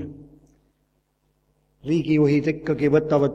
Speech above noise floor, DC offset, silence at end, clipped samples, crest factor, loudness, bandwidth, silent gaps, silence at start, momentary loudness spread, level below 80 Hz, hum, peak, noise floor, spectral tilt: 49 dB; under 0.1%; 0 s; under 0.1%; 18 dB; -21 LUFS; 7.6 kHz; none; 0 s; 13 LU; -54 dBFS; none; -6 dBFS; -69 dBFS; -8.5 dB/octave